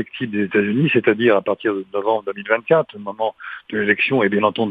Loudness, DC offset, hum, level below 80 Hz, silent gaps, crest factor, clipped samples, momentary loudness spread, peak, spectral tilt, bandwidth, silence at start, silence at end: -19 LUFS; under 0.1%; none; -66 dBFS; none; 18 dB; under 0.1%; 9 LU; 0 dBFS; -9 dB/octave; 4.9 kHz; 0 s; 0 s